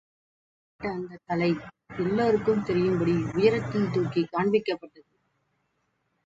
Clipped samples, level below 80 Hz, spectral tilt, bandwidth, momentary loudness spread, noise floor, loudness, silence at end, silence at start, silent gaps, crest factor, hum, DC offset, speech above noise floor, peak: under 0.1%; -58 dBFS; -8 dB/octave; 7.8 kHz; 11 LU; -75 dBFS; -26 LUFS; 1.4 s; 0.8 s; none; 20 dB; none; under 0.1%; 49 dB; -8 dBFS